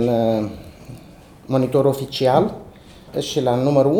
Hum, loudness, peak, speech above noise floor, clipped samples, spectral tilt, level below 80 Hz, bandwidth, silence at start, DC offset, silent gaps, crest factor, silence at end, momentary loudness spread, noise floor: none; -20 LUFS; -2 dBFS; 26 dB; under 0.1%; -6.5 dB/octave; -50 dBFS; 19 kHz; 0 s; under 0.1%; none; 18 dB; 0 s; 22 LU; -43 dBFS